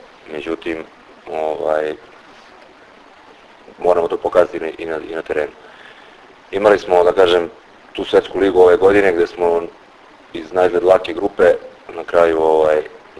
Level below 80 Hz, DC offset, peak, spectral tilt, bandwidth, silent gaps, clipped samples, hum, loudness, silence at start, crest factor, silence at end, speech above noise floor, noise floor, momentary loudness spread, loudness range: -48 dBFS; under 0.1%; 0 dBFS; -5.5 dB/octave; 11 kHz; none; under 0.1%; none; -16 LUFS; 0.3 s; 16 dB; 0.2 s; 29 dB; -44 dBFS; 17 LU; 9 LU